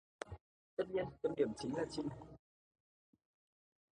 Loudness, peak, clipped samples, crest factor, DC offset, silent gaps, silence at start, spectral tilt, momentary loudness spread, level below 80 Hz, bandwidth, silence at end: -42 LUFS; -22 dBFS; under 0.1%; 22 dB; under 0.1%; 0.41-0.77 s; 0.2 s; -6 dB/octave; 17 LU; -68 dBFS; 10 kHz; 1.55 s